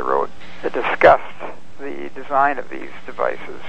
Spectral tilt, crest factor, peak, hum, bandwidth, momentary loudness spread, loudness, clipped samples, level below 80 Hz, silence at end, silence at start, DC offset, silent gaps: -5.5 dB/octave; 20 dB; 0 dBFS; none; 8.6 kHz; 20 LU; -19 LUFS; under 0.1%; -50 dBFS; 0 s; 0 s; 5%; none